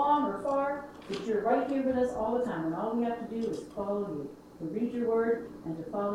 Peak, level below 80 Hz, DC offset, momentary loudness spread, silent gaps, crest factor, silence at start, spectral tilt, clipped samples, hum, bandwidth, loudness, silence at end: -14 dBFS; -62 dBFS; under 0.1%; 11 LU; none; 16 dB; 0 s; -7 dB/octave; under 0.1%; none; 13 kHz; -32 LUFS; 0 s